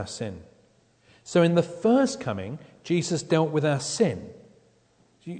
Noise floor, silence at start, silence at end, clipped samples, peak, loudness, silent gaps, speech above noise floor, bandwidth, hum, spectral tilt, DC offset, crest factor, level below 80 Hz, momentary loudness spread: -63 dBFS; 0 s; 0 s; under 0.1%; -8 dBFS; -25 LUFS; none; 38 dB; 9.4 kHz; none; -5.5 dB/octave; under 0.1%; 18 dB; -64 dBFS; 17 LU